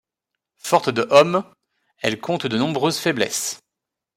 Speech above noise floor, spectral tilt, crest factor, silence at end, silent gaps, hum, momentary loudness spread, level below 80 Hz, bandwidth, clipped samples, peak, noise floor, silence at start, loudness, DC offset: 65 dB; -4 dB/octave; 20 dB; 0.6 s; none; none; 11 LU; -66 dBFS; 16 kHz; under 0.1%; -2 dBFS; -84 dBFS; 0.65 s; -20 LUFS; under 0.1%